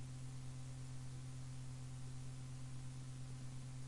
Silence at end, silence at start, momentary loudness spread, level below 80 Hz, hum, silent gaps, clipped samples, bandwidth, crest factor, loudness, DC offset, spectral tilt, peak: 0 s; 0 s; 0 LU; -62 dBFS; 60 Hz at -65 dBFS; none; under 0.1%; 11.5 kHz; 10 dB; -51 LUFS; 0.1%; -5.5 dB/octave; -40 dBFS